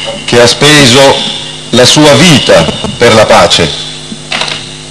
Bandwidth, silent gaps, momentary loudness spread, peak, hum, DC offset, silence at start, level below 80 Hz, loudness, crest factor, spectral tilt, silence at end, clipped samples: 12 kHz; none; 14 LU; 0 dBFS; none; under 0.1%; 0 s; -34 dBFS; -4 LUFS; 6 dB; -3.5 dB/octave; 0 s; 20%